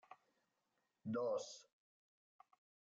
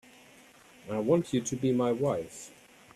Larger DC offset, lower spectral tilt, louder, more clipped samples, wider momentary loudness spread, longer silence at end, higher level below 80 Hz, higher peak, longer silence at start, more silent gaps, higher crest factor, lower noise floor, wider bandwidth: neither; about the same, -5.5 dB/octave vs -6 dB/octave; second, -45 LUFS vs -29 LUFS; neither; first, 24 LU vs 19 LU; first, 1.3 s vs 0.5 s; second, under -90 dBFS vs -66 dBFS; second, -32 dBFS vs -12 dBFS; second, 0.1 s vs 0.85 s; neither; about the same, 18 dB vs 18 dB; first, -87 dBFS vs -56 dBFS; second, 7.8 kHz vs 13.5 kHz